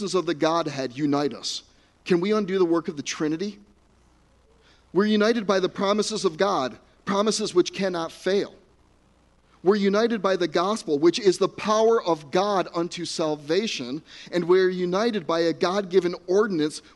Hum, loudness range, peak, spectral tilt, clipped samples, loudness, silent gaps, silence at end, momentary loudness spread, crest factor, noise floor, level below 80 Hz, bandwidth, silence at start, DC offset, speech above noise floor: none; 4 LU; -6 dBFS; -5 dB/octave; under 0.1%; -24 LUFS; none; 0.15 s; 9 LU; 18 dB; -60 dBFS; -64 dBFS; 11.5 kHz; 0 s; under 0.1%; 36 dB